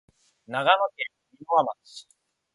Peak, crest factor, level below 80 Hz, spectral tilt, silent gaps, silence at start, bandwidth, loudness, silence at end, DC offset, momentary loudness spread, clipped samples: -6 dBFS; 22 dB; -76 dBFS; -4 dB/octave; none; 0.5 s; 11.5 kHz; -25 LUFS; 0.55 s; under 0.1%; 21 LU; under 0.1%